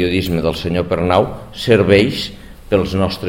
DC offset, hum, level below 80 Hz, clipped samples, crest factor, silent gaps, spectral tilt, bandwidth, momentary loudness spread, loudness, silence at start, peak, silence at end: 0.3%; none; -36 dBFS; under 0.1%; 16 dB; none; -6.5 dB/octave; 16.5 kHz; 11 LU; -16 LUFS; 0 s; 0 dBFS; 0 s